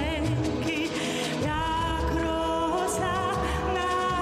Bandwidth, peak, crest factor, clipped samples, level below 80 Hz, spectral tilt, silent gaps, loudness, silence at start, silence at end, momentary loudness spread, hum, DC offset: 15 kHz; -14 dBFS; 12 dB; under 0.1%; -38 dBFS; -5 dB/octave; none; -27 LUFS; 0 s; 0 s; 2 LU; none; under 0.1%